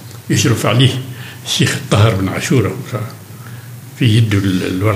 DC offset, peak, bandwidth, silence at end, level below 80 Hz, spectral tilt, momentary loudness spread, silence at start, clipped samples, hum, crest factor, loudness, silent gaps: under 0.1%; 0 dBFS; 16 kHz; 0 s; -54 dBFS; -5 dB/octave; 19 LU; 0 s; under 0.1%; none; 14 dB; -15 LUFS; none